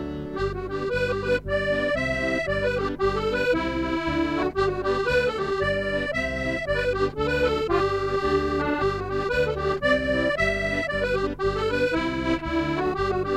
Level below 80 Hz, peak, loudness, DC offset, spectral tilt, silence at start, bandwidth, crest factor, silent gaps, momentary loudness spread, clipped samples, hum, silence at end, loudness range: -38 dBFS; -10 dBFS; -25 LUFS; under 0.1%; -6 dB/octave; 0 s; 12.5 kHz; 16 dB; none; 3 LU; under 0.1%; none; 0 s; 1 LU